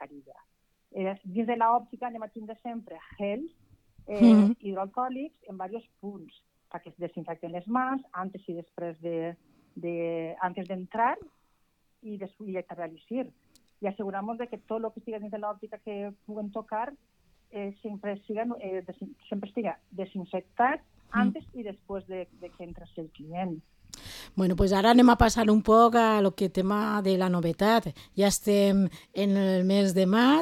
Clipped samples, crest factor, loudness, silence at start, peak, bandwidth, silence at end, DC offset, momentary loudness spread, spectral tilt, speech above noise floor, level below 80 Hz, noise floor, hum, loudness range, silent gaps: under 0.1%; 22 dB; -27 LUFS; 0 s; -8 dBFS; 15.5 kHz; 0 s; under 0.1%; 21 LU; -6 dB/octave; 43 dB; -48 dBFS; -70 dBFS; none; 14 LU; none